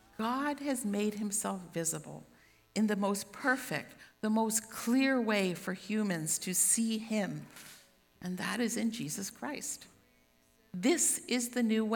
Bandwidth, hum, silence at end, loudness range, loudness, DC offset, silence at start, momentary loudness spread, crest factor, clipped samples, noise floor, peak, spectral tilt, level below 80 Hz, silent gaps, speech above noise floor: 19.5 kHz; none; 0 s; 6 LU; -33 LUFS; under 0.1%; 0.2 s; 14 LU; 18 dB; under 0.1%; -68 dBFS; -16 dBFS; -3.5 dB/octave; -74 dBFS; none; 35 dB